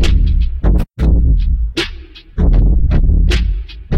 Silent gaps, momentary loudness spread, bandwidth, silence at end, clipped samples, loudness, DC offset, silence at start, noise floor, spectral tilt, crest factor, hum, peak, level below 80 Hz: none; 9 LU; 8.6 kHz; 0 s; under 0.1%; -15 LUFS; under 0.1%; 0 s; -31 dBFS; -6.5 dB/octave; 12 dB; none; 0 dBFS; -12 dBFS